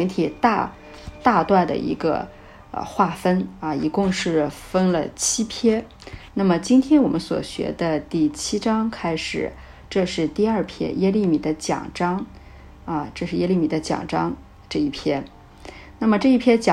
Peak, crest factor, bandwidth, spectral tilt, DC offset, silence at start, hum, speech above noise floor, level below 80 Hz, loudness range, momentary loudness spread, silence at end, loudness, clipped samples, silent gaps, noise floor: -4 dBFS; 18 dB; 13.5 kHz; -5 dB/octave; under 0.1%; 0 s; none; 22 dB; -46 dBFS; 4 LU; 13 LU; 0 s; -22 LUFS; under 0.1%; none; -43 dBFS